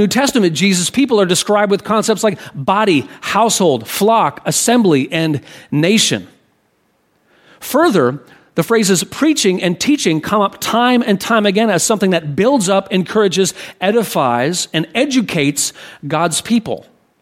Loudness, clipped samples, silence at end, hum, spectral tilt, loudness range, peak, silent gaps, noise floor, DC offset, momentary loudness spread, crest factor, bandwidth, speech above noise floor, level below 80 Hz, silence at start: -14 LUFS; under 0.1%; 0.4 s; none; -4 dB/octave; 3 LU; 0 dBFS; none; -60 dBFS; under 0.1%; 6 LU; 14 dB; 16.5 kHz; 46 dB; -56 dBFS; 0 s